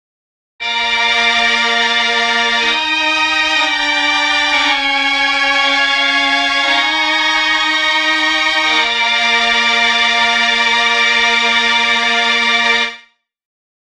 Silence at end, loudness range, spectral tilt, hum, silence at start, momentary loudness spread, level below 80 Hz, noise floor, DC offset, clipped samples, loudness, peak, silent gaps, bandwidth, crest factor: 0.9 s; 1 LU; 0.5 dB/octave; none; 0.6 s; 2 LU; -48 dBFS; -46 dBFS; under 0.1%; under 0.1%; -11 LUFS; 0 dBFS; none; 12.5 kHz; 14 dB